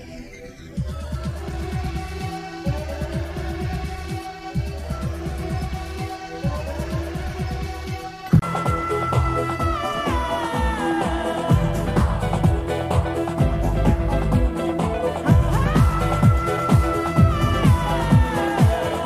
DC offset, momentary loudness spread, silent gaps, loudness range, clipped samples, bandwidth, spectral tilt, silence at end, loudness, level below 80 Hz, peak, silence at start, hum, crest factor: under 0.1%; 12 LU; none; 10 LU; under 0.1%; 15 kHz; -7 dB/octave; 0 s; -22 LUFS; -28 dBFS; -4 dBFS; 0 s; none; 18 dB